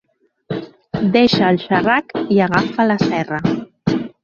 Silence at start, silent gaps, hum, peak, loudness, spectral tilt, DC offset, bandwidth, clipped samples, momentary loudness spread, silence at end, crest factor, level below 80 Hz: 0.5 s; none; none; -2 dBFS; -16 LUFS; -7 dB/octave; under 0.1%; 7.2 kHz; under 0.1%; 14 LU; 0.15 s; 16 dB; -50 dBFS